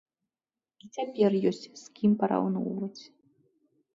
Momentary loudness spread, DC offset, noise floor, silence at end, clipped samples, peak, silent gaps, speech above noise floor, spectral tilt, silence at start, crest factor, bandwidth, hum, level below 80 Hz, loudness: 17 LU; under 0.1%; under -90 dBFS; 0.9 s; under 0.1%; -12 dBFS; none; over 62 dB; -7.5 dB/octave; 0.85 s; 18 dB; 7.6 kHz; none; -72 dBFS; -28 LUFS